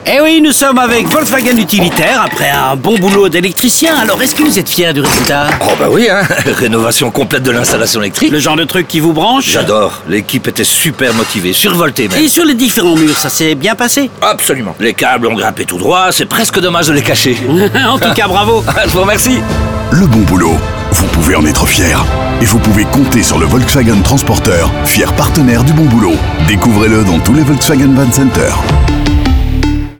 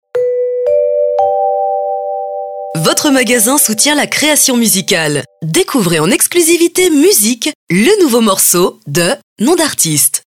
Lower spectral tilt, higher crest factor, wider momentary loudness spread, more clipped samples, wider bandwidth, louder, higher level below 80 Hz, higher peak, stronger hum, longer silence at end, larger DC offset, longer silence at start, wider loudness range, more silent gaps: about the same, -4 dB/octave vs -3 dB/octave; about the same, 8 dB vs 12 dB; second, 4 LU vs 8 LU; neither; first, over 20 kHz vs 18 kHz; about the same, -9 LUFS vs -10 LUFS; first, -22 dBFS vs -52 dBFS; about the same, 0 dBFS vs 0 dBFS; neither; about the same, 0.05 s vs 0.1 s; first, 0.9% vs under 0.1%; second, 0 s vs 0.15 s; about the same, 1 LU vs 3 LU; second, none vs 7.55-7.67 s, 9.23-9.36 s